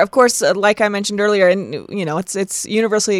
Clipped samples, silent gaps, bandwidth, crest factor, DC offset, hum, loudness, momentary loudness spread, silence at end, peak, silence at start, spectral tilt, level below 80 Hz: under 0.1%; none; 15.5 kHz; 16 dB; under 0.1%; none; -16 LUFS; 8 LU; 0 s; 0 dBFS; 0 s; -3.5 dB/octave; -60 dBFS